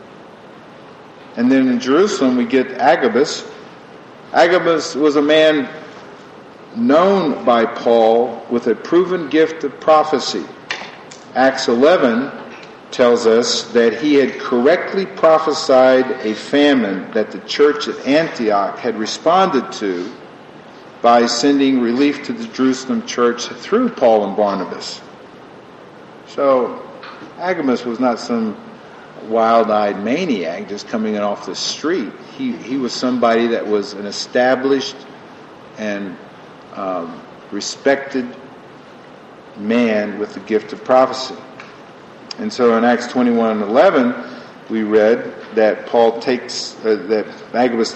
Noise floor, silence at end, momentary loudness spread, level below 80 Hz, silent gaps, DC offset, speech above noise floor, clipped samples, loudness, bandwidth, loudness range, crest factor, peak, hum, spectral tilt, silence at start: -39 dBFS; 0 s; 16 LU; -64 dBFS; none; under 0.1%; 24 dB; under 0.1%; -16 LUFS; 8.6 kHz; 6 LU; 16 dB; 0 dBFS; none; -4.5 dB/octave; 0 s